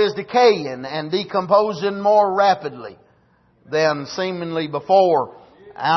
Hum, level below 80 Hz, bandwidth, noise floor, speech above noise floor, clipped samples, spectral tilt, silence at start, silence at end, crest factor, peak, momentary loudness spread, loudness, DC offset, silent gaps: none; -66 dBFS; 6.2 kHz; -58 dBFS; 39 dB; under 0.1%; -5 dB/octave; 0 s; 0 s; 16 dB; -4 dBFS; 12 LU; -19 LUFS; under 0.1%; none